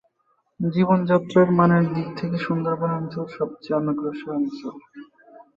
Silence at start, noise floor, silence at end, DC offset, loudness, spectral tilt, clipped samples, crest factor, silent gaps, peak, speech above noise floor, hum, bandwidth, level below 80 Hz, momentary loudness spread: 0.6 s; -68 dBFS; 0.15 s; under 0.1%; -22 LUFS; -9.5 dB/octave; under 0.1%; 18 dB; none; -6 dBFS; 47 dB; none; 7.2 kHz; -62 dBFS; 12 LU